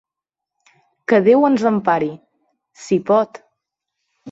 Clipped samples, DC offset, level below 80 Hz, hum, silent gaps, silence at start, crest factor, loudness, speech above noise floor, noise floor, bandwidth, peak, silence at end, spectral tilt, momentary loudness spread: under 0.1%; under 0.1%; -66 dBFS; none; none; 1.1 s; 16 dB; -17 LUFS; 70 dB; -85 dBFS; 8 kHz; -2 dBFS; 0 s; -7 dB/octave; 14 LU